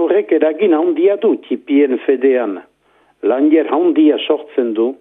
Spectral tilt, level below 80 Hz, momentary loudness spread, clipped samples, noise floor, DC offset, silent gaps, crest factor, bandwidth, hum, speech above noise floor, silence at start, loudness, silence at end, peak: -8 dB/octave; -74 dBFS; 6 LU; under 0.1%; -56 dBFS; under 0.1%; none; 14 dB; 3.8 kHz; none; 42 dB; 0 s; -14 LUFS; 0.05 s; 0 dBFS